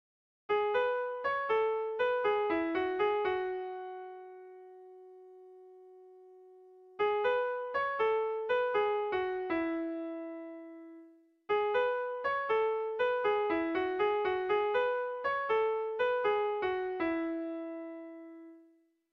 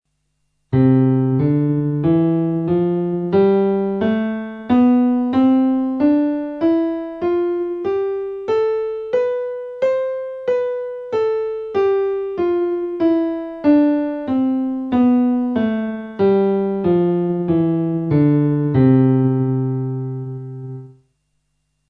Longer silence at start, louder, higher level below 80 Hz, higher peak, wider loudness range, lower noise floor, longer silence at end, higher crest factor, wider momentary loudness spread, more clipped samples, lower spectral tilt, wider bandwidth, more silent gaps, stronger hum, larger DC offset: second, 0.5 s vs 0.7 s; second, -32 LUFS vs -18 LUFS; second, -70 dBFS vs -52 dBFS; second, -20 dBFS vs -2 dBFS; about the same, 6 LU vs 4 LU; about the same, -66 dBFS vs -69 dBFS; second, 0.5 s vs 1 s; about the same, 14 dB vs 14 dB; first, 18 LU vs 9 LU; neither; second, -6 dB/octave vs -11 dB/octave; first, 6 kHz vs 5 kHz; neither; neither; neither